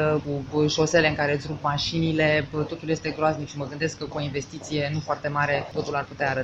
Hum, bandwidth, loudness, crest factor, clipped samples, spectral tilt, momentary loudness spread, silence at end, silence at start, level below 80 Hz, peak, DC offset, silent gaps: none; 8.2 kHz; -25 LUFS; 18 dB; under 0.1%; -5 dB/octave; 9 LU; 0 s; 0 s; -50 dBFS; -8 dBFS; under 0.1%; none